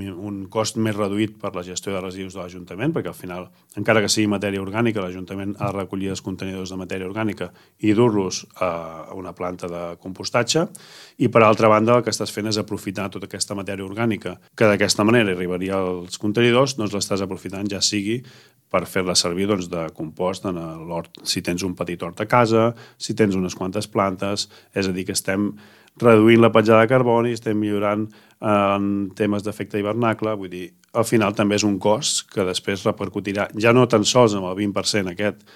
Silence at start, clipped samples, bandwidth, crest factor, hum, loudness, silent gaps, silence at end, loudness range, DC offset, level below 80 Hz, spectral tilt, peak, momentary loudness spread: 0 s; under 0.1%; 15.5 kHz; 20 dB; none; -21 LUFS; none; 0.2 s; 7 LU; under 0.1%; -60 dBFS; -4.5 dB/octave; -2 dBFS; 14 LU